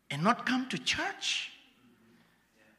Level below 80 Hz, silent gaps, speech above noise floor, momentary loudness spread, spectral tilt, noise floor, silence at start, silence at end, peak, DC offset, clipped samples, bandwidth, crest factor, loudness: -70 dBFS; none; 34 dB; 5 LU; -3.5 dB/octave; -66 dBFS; 0.1 s; 1.25 s; -12 dBFS; under 0.1%; under 0.1%; 14 kHz; 24 dB; -31 LUFS